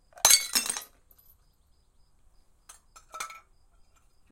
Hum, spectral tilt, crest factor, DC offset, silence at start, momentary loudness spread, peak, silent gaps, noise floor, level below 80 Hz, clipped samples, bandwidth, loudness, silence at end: none; 2.5 dB/octave; 32 dB; under 0.1%; 0.25 s; 21 LU; 0 dBFS; none; -64 dBFS; -62 dBFS; under 0.1%; 17 kHz; -22 LUFS; 0.95 s